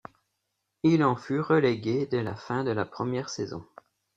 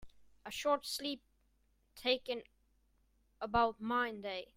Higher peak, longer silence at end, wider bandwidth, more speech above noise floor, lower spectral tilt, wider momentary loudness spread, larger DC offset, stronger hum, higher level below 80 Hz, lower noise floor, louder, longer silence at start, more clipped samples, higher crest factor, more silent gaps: first, -10 dBFS vs -18 dBFS; first, 0.55 s vs 0.1 s; second, 7.8 kHz vs 16 kHz; first, 54 dB vs 38 dB; first, -6.5 dB/octave vs -3 dB/octave; about the same, 11 LU vs 13 LU; neither; neither; about the same, -66 dBFS vs -64 dBFS; first, -80 dBFS vs -75 dBFS; first, -27 LUFS vs -37 LUFS; first, 0.85 s vs 0 s; neither; about the same, 18 dB vs 20 dB; neither